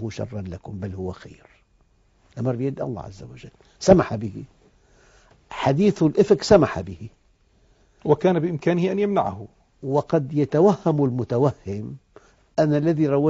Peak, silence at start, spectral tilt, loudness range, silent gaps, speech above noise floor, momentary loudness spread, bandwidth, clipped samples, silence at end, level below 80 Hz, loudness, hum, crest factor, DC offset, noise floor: 0 dBFS; 0 s; -7 dB/octave; 4 LU; none; 39 dB; 21 LU; 7.8 kHz; under 0.1%; 0 s; -50 dBFS; -22 LUFS; none; 22 dB; under 0.1%; -61 dBFS